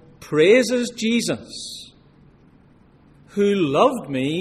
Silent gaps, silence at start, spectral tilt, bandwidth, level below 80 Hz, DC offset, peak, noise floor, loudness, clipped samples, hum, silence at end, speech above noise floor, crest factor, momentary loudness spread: none; 0.2 s; -4.5 dB/octave; 14 kHz; -58 dBFS; under 0.1%; -2 dBFS; -52 dBFS; -19 LUFS; under 0.1%; none; 0 s; 33 dB; 20 dB; 17 LU